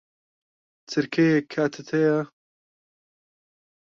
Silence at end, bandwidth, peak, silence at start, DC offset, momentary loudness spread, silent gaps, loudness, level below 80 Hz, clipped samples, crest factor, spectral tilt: 1.75 s; 7.4 kHz; -10 dBFS; 0.9 s; under 0.1%; 8 LU; none; -24 LUFS; -70 dBFS; under 0.1%; 18 dB; -6.5 dB/octave